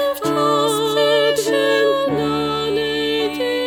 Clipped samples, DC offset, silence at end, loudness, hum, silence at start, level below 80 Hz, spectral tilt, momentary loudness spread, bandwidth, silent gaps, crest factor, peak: under 0.1%; under 0.1%; 0 s; -17 LUFS; none; 0 s; -52 dBFS; -4 dB/octave; 4 LU; 19.5 kHz; none; 12 dB; -6 dBFS